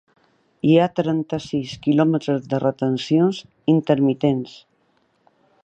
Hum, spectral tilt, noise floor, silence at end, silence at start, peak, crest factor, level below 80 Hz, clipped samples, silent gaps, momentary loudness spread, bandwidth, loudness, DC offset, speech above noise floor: none; -7.5 dB/octave; -64 dBFS; 1.15 s; 0.65 s; -4 dBFS; 18 dB; -60 dBFS; under 0.1%; none; 8 LU; 8.2 kHz; -20 LUFS; under 0.1%; 45 dB